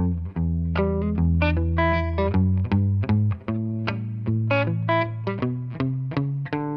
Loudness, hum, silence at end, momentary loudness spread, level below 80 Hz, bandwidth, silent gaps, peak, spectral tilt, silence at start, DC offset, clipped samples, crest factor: -24 LUFS; none; 0 s; 6 LU; -34 dBFS; 5.6 kHz; none; -8 dBFS; -10 dB/octave; 0 s; under 0.1%; under 0.1%; 16 dB